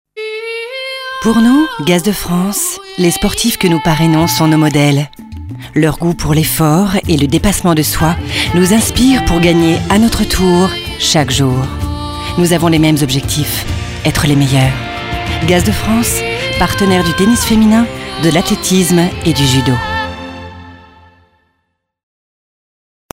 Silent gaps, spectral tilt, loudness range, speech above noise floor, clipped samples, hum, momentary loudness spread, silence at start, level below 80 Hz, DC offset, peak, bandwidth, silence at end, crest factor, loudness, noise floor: none; -5 dB/octave; 3 LU; 56 dB; under 0.1%; none; 10 LU; 0.15 s; -28 dBFS; under 0.1%; 0 dBFS; 16.5 kHz; 2.35 s; 12 dB; -12 LUFS; -67 dBFS